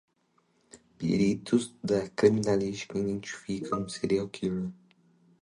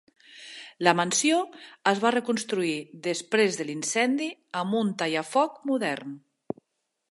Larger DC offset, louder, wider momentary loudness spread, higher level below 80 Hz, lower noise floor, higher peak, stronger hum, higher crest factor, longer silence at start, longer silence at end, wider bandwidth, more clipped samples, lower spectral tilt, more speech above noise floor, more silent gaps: neither; second, -29 LUFS vs -26 LUFS; second, 11 LU vs 17 LU; first, -60 dBFS vs -78 dBFS; second, -71 dBFS vs -79 dBFS; second, -8 dBFS vs -4 dBFS; neither; about the same, 22 dB vs 24 dB; first, 0.75 s vs 0.3 s; second, 0.7 s vs 0.95 s; about the same, 11 kHz vs 11.5 kHz; neither; first, -6 dB/octave vs -3.5 dB/octave; second, 42 dB vs 53 dB; neither